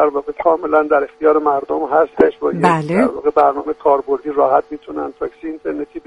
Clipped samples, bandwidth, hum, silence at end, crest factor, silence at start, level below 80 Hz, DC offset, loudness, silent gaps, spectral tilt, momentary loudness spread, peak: under 0.1%; 11 kHz; none; 0.1 s; 16 dB; 0 s; -52 dBFS; under 0.1%; -16 LUFS; none; -7.5 dB/octave; 11 LU; 0 dBFS